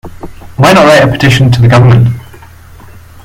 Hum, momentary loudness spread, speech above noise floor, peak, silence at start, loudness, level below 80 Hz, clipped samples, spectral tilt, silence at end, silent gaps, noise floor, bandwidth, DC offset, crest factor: none; 10 LU; 28 dB; 0 dBFS; 0.05 s; -5 LUFS; -32 dBFS; 2%; -6 dB/octave; 1 s; none; -32 dBFS; 15.5 kHz; under 0.1%; 8 dB